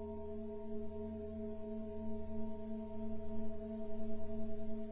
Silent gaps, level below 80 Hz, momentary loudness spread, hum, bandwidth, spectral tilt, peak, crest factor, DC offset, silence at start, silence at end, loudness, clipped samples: none; -54 dBFS; 1 LU; none; 4 kHz; -9.5 dB/octave; -26 dBFS; 12 dB; under 0.1%; 0 s; 0 s; -46 LUFS; under 0.1%